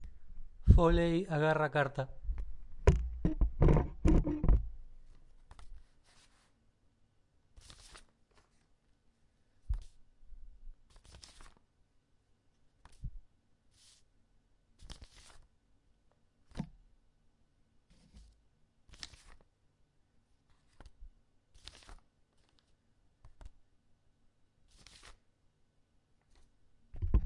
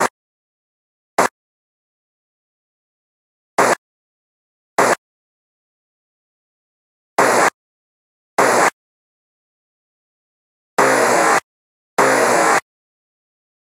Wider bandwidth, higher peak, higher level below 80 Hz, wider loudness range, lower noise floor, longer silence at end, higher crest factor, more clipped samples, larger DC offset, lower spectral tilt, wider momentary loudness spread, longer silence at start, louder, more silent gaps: second, 11 kHz vs 16 kHz; second, -10 dBFS vs 0 dBFS; first, -40 dBFS vs -68 dBFS; first, 26 LU vs 8 LU; second, -72 dBFS vs under -90 dBFS; second, 0 s vs 1.1 s; first, 28 dB vs 20 dB; neither; neither; first, -7.5 dB/octave vs -2.5 dB/octave; first, 27 LU vs 11 LU; about the same, 0 s vs 0 s; second, -33 LUFS vs -16 LUFS; second, none vs 0.10-1.17 s, 1.31-3.57 s, 3.78-4.76 s, 4.98-7.17 s, 7.54-8.37 s, 8.73-10.77 s, 11.44-11.97 s